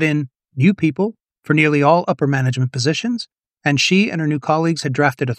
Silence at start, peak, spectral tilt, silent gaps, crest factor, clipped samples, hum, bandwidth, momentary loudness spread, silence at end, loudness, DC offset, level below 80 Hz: 0 s; 0 dBFS; -5.5 dB/octave; none; 18 dB; under 0.1%; none; 13 kHz; 9 LU; 0 s; -17 LUFS; under 0.1%; -62 dBFS